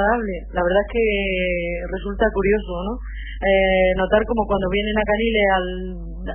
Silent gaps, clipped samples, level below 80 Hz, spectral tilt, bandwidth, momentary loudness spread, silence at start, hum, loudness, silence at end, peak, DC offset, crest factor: none; under 0.1%; -30 dBFS; -10 dB/octave; 3.4 kHz; 11 LU; 0 s; none; -20 LUFS; 0 s; -4 dBFS; under 0.1%; 16 dB